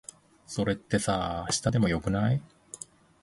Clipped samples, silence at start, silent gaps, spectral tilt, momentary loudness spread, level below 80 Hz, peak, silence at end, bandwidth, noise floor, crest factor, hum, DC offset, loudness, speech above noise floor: under 0.1%; 0.5 s; none; -5 dB/octave; 18 LU; -48 dBFS; -10 dBFS; 0.45 s; 11.5 kHz; -48 dBFS; 18 dB; none; under 0.1%; -28 LUFS; 20 dB